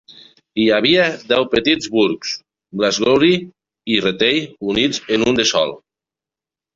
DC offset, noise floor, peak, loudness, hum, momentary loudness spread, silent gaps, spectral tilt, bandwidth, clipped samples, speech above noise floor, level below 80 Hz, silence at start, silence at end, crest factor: under 0.1%; -89 dBFS; -2 dBFS; -16 LUFS; none; 10 LU; none; -3.5 dB/octave; 7.6 kHz; under 0.1%; 72 dB; -52 dBFS; 0.55 s; 1 s; 16 dB